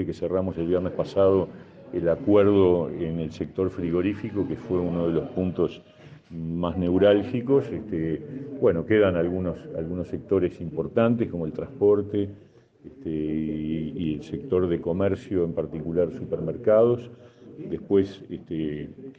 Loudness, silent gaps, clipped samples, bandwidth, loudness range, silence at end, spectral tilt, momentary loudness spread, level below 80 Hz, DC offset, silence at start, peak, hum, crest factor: -25 LUFS; none; under 0.1%; 7.4 kHz; 4 LU; 0.05 s; -9 dB/octave; 13 LU; -56 dBFS; under 0.1%; 0 s; -6 dBFS; none; 18 dB